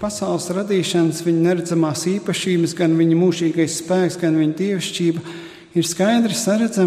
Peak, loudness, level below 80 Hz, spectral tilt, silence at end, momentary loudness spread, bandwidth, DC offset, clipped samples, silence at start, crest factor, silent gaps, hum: -6 dBFS; -19 LUFS; -58 dBFS; -5 dB/octave; 0 s; 6 LU; 15 kHz; under 0.1%; under 0.1%; 0 s; 14 dB; none; none